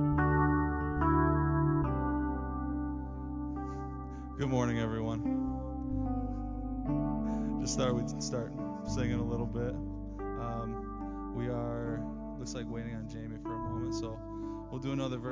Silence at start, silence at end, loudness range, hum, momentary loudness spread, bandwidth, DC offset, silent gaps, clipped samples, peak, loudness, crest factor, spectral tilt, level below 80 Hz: 0 s; 0 s; 6 LU; none; 12 LU; 7.6 kHz; under 0.1%; none; under 0.1%; -16 dBFS; -35 LUFS; 18 dB; -6.5 dB/octave; -42 dBFS